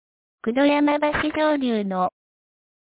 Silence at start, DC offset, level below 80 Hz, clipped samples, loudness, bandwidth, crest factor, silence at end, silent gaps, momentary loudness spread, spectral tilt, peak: 0.45 s; under 0.1%; -52 dBFS; under 0.1%; -22 LUFS; 4 kHz; 14 dB; 0.9 s; none; 8 LU; -9.5 dB/octave; -8 dBFS